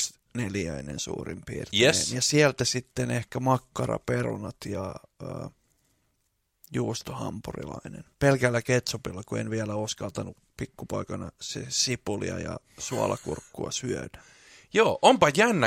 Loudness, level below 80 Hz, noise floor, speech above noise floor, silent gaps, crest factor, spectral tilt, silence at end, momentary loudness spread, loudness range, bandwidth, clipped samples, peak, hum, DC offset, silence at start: -27 LUFS; -54 dBFS; -75 dBFS; 47 dB; none; 24 dB; -4 dB/octave; 0 s; 17 LU; 9 LU; 16.5 kHz; under 0.1%; -4 dBFS; none; under 0.1%; 0 s